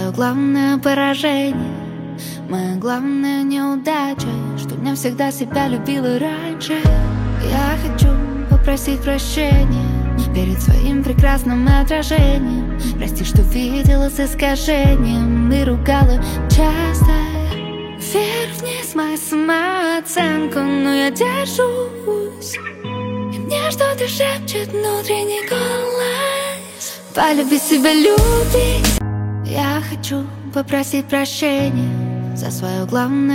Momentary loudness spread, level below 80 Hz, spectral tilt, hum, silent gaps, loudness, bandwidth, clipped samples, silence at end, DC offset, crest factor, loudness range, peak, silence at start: 8 LU; -22 dBFS; -5.5 dB/octave; none; none; -17 LUFS; 16.5 kHz; under 0.1%; 0 s; under 0.1%; 16 dB; 4 LU; 0 dBFS; 0 s